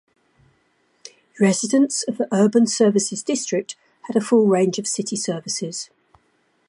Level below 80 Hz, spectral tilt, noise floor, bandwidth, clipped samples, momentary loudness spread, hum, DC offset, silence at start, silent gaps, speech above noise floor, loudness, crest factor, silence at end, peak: -72 dBFS; -4.5 dB/octave; -64 dBFS; 11.5 kHz; under 0.1%; 11 LU; none; under 0.1%; 1.05 s; none; 45 dB; -20 LUFS; 18 dB; 0.85 s; -4 dBFS